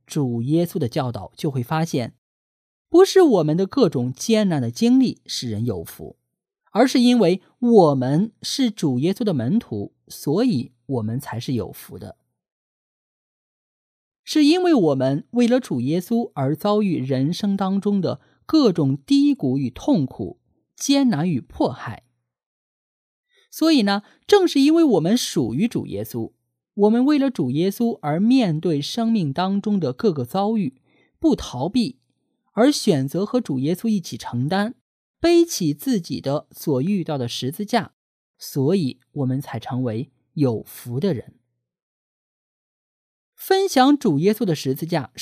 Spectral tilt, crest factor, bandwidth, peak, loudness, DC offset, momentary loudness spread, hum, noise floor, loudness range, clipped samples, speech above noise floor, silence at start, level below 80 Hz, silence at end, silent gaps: -6 dB/octave; 20 dB; 15.5 kHz; -2 dBFS; -20 LUFS; under 0.1%; 12 LU; none; -71 dBFS; 7 LU; under 0.1%; 52 dB; 0.1 s; -58 dBFS; 0 s; 2.18-2.85 s, 12.52-14.12 s, 14.19-14.24 s, 22.46-23.24 s, 34.81-35.14 s, 37.93-38.34 s, 41.82-43.33 s